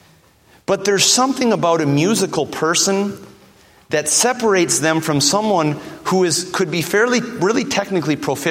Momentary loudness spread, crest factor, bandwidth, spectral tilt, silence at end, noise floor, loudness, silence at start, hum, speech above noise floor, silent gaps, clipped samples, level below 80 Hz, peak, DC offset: 7 LU; 18 dB; 16.5 kHz; -3.5 dB/octave; 0 s; -51 dBFS; -16 LUFS; 0.7 s; none; 35 dB; none; under 0.1%; -58 dBFS; 0 dBFS; under 0.1%